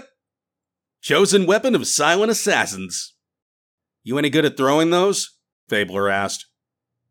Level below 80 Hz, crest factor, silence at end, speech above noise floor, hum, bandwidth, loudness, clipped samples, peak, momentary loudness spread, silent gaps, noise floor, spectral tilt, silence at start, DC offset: -72 dBFS; 18 dB; 0.7 s; 68 dB; none; 19.5 kHz; -19 LUFS; under 0.1%; -4 dBFS; 12 LU; 3.42-3.78 s, 5.52-5.67 s; -87 dBFS; -3.5 dB/octave; 1.05 s; under 0.1%